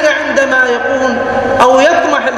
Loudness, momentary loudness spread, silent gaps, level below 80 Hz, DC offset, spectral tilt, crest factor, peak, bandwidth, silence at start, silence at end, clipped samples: -10 LUFS; 6 LU; none; -42 dBFS; under 0.1%; -3.5 dB/octave; 10 dB; 0 dBFS; 13 kHz; 0 s; 0 s; 0.3%